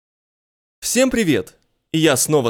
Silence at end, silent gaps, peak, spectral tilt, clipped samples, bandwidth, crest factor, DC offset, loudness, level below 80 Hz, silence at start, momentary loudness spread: 0 s; none; 0 dBFS; -4 dB/octave; under 0.1%; 19.5 kHz; 18 dB; under 0.1%; -18 LUFS; -50 dBFS; 0.8 s; 11 LU